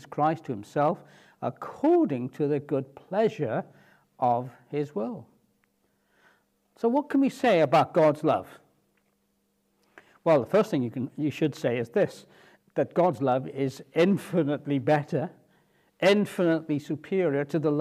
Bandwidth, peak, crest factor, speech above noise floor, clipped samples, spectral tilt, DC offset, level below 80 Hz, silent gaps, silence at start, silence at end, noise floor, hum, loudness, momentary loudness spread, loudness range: 14.5 kHz; -10 dBFS; 18 dB; 47 dB; under 0.1%; -7 dB/octave; under 0.1%; -76 dBFS; none; 0.1 s; 0 s; -72 dBFS; none; -27 LUFS; 11 LU; 5 LU